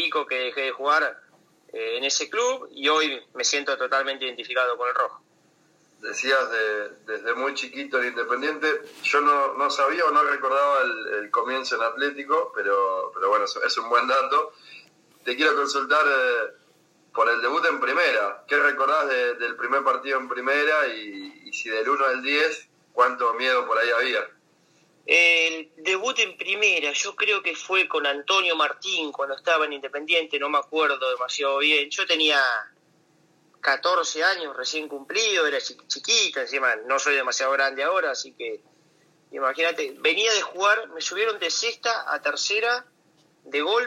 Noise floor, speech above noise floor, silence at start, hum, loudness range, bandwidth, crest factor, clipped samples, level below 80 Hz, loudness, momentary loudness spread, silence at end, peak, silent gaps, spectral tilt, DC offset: -62 dBFS; 38 dB; 0 s; none; 3 LU; 14 kHz; 18 dB; under 0.1%; -86 dBFS; -23 LUFS; 9 LU; 0 s; -6 dBFS; none; 0.5 dB/octave; under 0.1%